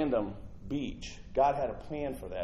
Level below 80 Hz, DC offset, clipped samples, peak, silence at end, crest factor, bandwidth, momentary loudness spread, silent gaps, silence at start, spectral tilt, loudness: -48 dBFS; under 0.1%; under 0.1%; -16 dBFS; 0 s; 18 dB; 13.5 kHz; 12 LU; none; 0 s; -6.5 dB/octave; -34 LUFS